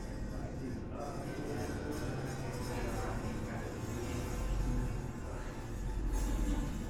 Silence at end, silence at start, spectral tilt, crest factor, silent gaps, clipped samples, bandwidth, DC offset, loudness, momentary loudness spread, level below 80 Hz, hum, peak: 0 s; 0 s; -6 dB/octave; 14 dB; none; under 0.1%; 16 kHz; under 0.1%; -40 LUFS; 5 LU; -40 dBFS; none; -24 dBFS